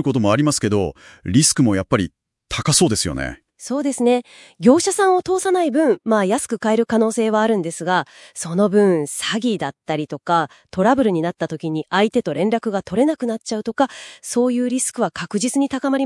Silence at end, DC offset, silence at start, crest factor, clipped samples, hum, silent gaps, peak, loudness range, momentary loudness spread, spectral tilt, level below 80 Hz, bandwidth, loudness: 0 s; under 0.1%; 0 s; 18 dB; under 0.1%; none; none; 0 dBFS; 3 LU; 10 LU; -4.5 dB/octave; -50 dBFS; 12 kHz; -19 LUFS